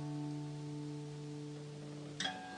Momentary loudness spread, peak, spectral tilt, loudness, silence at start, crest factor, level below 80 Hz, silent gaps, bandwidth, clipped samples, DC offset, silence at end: 8 LU; -26 dBFS; -5 dB/octave; -45 LUFS; 0 s; 20 dB; -78 dBFS; none; 10.5 kHz; under 0.1%; under 0.1%; 0 s